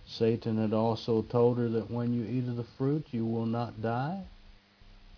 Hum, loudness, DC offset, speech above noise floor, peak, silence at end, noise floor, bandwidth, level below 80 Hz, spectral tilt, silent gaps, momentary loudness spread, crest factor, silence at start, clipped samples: none; -31 LUFS; under 0.1%; 26 dB; -12 dBFS; 0.1 s; -56 dBFS; 5.4 kHz; -60 dBFS; -9 dB/octave; none; 7 LU; 18 dB; 0 s; under 0.1%